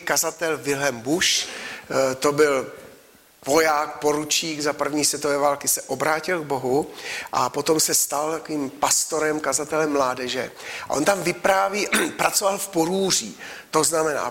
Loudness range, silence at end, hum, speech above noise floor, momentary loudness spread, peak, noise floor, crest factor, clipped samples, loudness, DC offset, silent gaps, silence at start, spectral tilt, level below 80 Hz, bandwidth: 1 LU; 0 s; none; 29 dB; 8 LU; -6 dBFS; -51 dBFS; 18 dB; under 0.1%; -22 LUFS; under 0.1%; none; 0 s; -2 dB/octave; -60 dBFS; 16.5 kHz